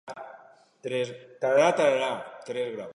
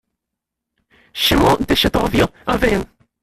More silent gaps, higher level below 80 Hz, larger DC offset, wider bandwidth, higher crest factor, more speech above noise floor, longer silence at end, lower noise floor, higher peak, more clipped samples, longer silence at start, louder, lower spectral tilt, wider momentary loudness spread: neither; second, -80 dBFS vs -32 dBFS; neither; second, 11 kHz vs 16 kHz; about the same, 20 dB vs 18 dB; second, 27 dB vs 65 dB; second, 0 s vs 0.35 s; second, -53 dBFS vs -81 dBFS; second, -8 dBFS vs -2 dBFS; neither; second, 0.05 s vs 1.15 s; second, -26 LUFS vs -16 LUFS; about the same, -4 dB/octave vs -4.5 dB/octave; first, 20 LU vs 9 LU